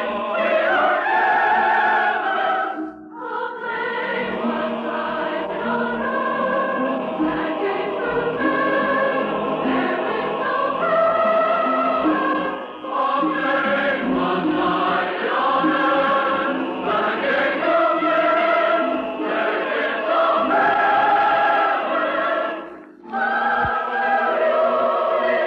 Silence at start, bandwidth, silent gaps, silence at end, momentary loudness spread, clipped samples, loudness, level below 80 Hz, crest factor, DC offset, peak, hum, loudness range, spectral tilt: 0 s; 6.4 kHz; none; 0 s; 7 LU; under 0.1%; -20 LUFS; -56 dBFS; 12 dB; under 0.1%; -8 dBFS; none; 4 LU; -6.5 dB/octave